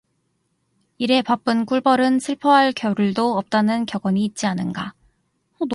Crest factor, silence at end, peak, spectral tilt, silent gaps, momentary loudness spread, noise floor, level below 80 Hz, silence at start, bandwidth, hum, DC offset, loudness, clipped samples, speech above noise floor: 16 dB; 0 s; -4 dBFS; -5.5 dB/octave; none; 10 LU; -69 dBFS; -62 dBFS; 1 s; 11.5 kHz; none; under 0.1%; -20 LUFS; under 0.1%; 50 dB